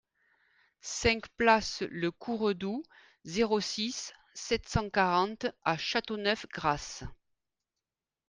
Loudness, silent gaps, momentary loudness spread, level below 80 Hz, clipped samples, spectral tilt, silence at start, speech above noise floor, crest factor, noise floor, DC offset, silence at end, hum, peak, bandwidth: -31 LUFS; none; 14 LU; -54 dBFS; under 0.1%; -4 dB/octave; 0.85 s; over 59 dB; 22 dB; under -90 dBFS; under 0.1%; 1.15 s; none; -10 dBFS; 10 kHz